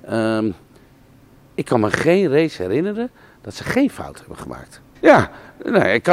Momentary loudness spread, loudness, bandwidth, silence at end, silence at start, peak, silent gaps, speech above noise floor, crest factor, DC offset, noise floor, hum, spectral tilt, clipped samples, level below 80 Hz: 21 LU; -18 LUFS; 15.5 kHz; 0 s; 0.05 s; 0 dBFS; none; 31 dB; 18 dB; under 0.1%; -49 dBFS; none; -6.5 dB/octave; under 0.1%; -52 dBFS